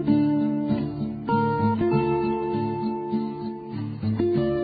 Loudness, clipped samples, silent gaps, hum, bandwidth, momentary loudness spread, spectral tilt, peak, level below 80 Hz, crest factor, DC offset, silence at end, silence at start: -25 LUFS; under 0.1%; none; none; 4.9 kHz; 9 LU; -12.5 dB/octave; -10 dBFS; -50 dBFS; 14 dB; under 0.1%; 0 s; 0 s